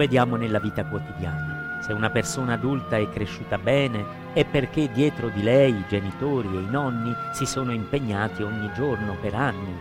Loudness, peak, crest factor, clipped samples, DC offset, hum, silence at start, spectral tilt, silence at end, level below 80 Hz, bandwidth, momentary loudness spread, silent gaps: -25 LUFS; -6 dBFS; 18 dB; under 0.1%; under 0.1%; none; 0 s; -6 dB/octave; 0 s; -48 dBFS; 16 kHz; 8 LU; none